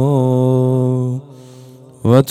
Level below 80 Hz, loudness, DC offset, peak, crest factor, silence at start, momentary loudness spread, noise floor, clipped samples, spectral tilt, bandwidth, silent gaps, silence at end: -56 dBFS; -15 LUFS; under 0.1%; 0 dBFS; 14 dB; 0 s; 9 LU; -39 dBFS; 0.2%; -8.5 dB/octave; 12 kHz; none; 0 s